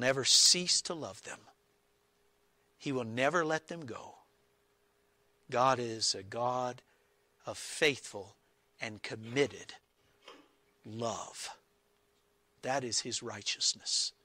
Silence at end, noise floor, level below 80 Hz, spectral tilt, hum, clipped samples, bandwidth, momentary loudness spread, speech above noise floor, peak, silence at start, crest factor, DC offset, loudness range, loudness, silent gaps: 0.15 s; -73 dBFS; -76 dBFS; -1.5 dB/octave; none; under 0.1%; 16 kHz; 21 LU; 40 dB; -12 dBFS; 0 s; 22 dB; under 0.1%; 6 LU; -31 LUFS; none